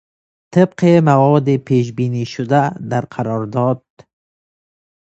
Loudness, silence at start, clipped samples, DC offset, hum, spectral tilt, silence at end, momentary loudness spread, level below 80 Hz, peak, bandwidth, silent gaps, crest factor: -16 LUFS; 0.5 s; under 0.1%; under 0.1%; none; -8 dB/octave; 1.25 s; 10 LU; -56 dBFS; 0 dBFS; 8 kHz; none; 16 dB